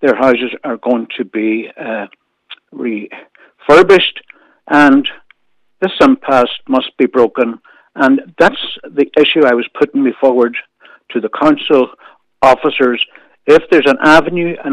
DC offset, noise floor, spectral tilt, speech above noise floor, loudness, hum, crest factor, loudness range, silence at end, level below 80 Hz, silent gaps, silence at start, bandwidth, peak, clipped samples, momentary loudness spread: under 0.1%; -61 dBFS; -5.5 dB/octave; 50 dB; -12 LUFS; none; 12 dB; 3 LU; 0 s; -48 dBFS; none; 0 s; 11.5 kHz; 0 dBFS; under 0.1%; 14 LU